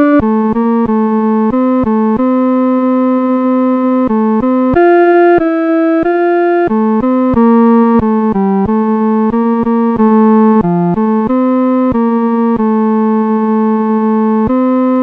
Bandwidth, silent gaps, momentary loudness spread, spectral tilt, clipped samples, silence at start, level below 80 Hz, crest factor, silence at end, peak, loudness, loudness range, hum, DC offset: 4.3 kHz; none; 4 LU; -10.5 dB/octave; under 0.1%; 0 s; -38 dBFS; 10 dB; 0 s; 0 dBFS; -10 LUFS; 2 LU; none; under 0.1%